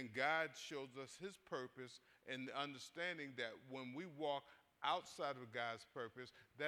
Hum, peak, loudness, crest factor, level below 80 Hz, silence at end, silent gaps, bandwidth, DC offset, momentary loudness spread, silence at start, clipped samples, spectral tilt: none; -24 dBFS; -47 LUFS; 22 dB; -88 dBFS; 0 s; none; 18 kHz; under 0.1%; 12 LU; 0 s; under 0.1%; -3.5 dB/octave